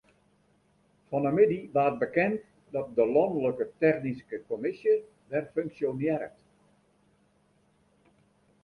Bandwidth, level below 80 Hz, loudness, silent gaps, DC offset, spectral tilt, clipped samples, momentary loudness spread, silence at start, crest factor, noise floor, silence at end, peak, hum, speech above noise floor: 5 kHz; -68 dBFS; -29 LUFS; none; under 0.1%; -9 dB/octave; under 0.1%; 11 LU; 1.1 s; 20 dB; -67 dBFS; 2.35 s; -10 dBFS; none; 40 dB